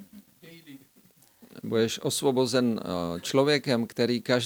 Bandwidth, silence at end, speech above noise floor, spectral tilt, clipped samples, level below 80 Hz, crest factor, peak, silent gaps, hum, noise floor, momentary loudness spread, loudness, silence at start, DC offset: over 20 kHz; 0 s; 34 dB; -4.5 dB/octave; under 0.1%; -70 dBFS; 20 dB; -8 dBFS; none; none; -60 dBFS; 7 LU; -26 LUFS; 0 s; under 0.1%